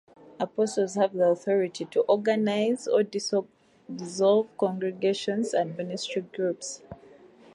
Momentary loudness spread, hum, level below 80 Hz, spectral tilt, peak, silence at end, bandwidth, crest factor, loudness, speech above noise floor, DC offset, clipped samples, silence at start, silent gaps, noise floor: 10 LU; none; -72 dBFS; -5 dB/octave; -10 dBFS; 0.6 s; 11.5 kHz; 16 dB; -27 LUFS; 26 dB; under 0.1%; under 0.1%; 0.25 s; none; -52 dBFS